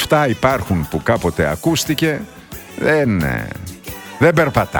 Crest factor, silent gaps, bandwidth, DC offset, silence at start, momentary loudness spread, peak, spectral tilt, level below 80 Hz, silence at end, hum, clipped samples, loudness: 16 dB; none; 19.5 kHz; under 0.1%; 0 s; 16 LU; 0 dBFS; -5.5 dB/octave; -38 dBFS; 0 s; none; under 0.1%; -17 LUFS